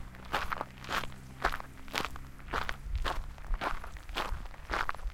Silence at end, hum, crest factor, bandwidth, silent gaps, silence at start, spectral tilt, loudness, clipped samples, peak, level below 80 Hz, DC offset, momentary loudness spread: 0 s; none; 26 dB; 17 kHz; none; 0 s; -3.5 dB/octave; -37 LUFS; under 0.1%; -10 dBFS; -40 dBFS; under 0.1%; 8 LU